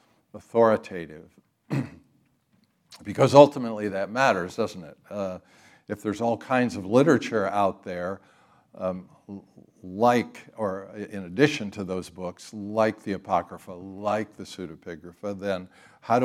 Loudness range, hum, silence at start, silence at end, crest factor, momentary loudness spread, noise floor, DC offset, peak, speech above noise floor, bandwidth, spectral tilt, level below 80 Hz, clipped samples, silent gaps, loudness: 7 LU; none; 0.35 s; 0 s; 26 dB; 19 LU; -67 dBFS; under 0.1%; 0 dBFS; 41 dB; 13.5 kHz; -6 dB/octave; -72 dBFS; under 0.1%; none; -25 LUFS